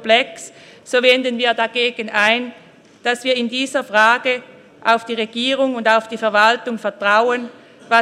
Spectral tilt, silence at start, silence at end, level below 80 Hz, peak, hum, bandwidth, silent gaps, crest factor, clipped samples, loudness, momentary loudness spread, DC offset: -2.5 dB/octave; 0 s; 0 s; -70 dBFS; 0 dBFS; none; 13.5 kHz; none; 18 dB; under 0.1%; -17 LUFS; 10 LU; under 0.1%